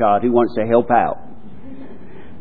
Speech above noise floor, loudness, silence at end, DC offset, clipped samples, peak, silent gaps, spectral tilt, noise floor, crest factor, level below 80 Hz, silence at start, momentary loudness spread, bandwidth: 24 dB; -16 LUFS; 0.05 s; 4%; under 0.1%; 0 dBFS; none; -11 dB/octave; -39 dBFS; 18 dB; -52 dBFS; 0 s; 23 LU; 4.9 kHz